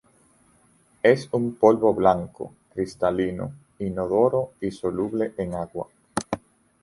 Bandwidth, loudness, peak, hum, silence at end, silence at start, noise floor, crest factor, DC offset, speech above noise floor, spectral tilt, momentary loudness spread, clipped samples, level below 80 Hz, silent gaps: 11.5 kHz; -24 LUFS; -2 dBFS; none; 0.45 s; 1.05 s; -60 dBFS; 22 dB; under 0.1%; 37 dB; -6.5 dB/octave; 15 LU; under 0.1%; -54 dBFS; none